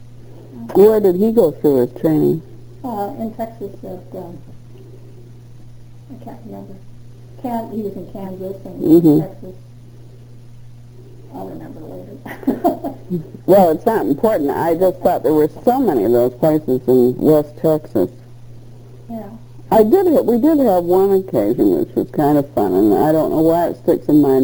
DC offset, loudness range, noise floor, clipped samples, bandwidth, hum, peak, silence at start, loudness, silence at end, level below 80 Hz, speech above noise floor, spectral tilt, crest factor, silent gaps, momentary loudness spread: under 0.1%; 16 LU; -38 dBFS; under 0.1%; over 20 kHz; 60 Hz at -40 dBFS; 0 dBFS; 0 s; -15 LUFS; 0 s; -48 dBFS; 23 dB; -8.5 dB/octave; 16 dB; none; 21 LU